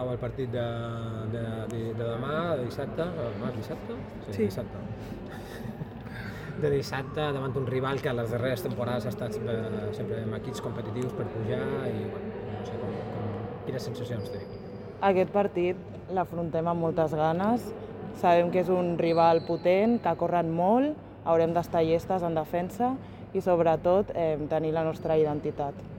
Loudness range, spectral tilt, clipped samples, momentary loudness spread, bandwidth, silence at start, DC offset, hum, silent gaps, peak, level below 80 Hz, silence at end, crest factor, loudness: 8 LU; -7.5 dB/octave; under 0.1%; 14 LU; 17 kHz; 0 s; under 0.1%; none; none; -10 dBFS; -54 dBFS; 0 s; 18 dB; -29 LUFS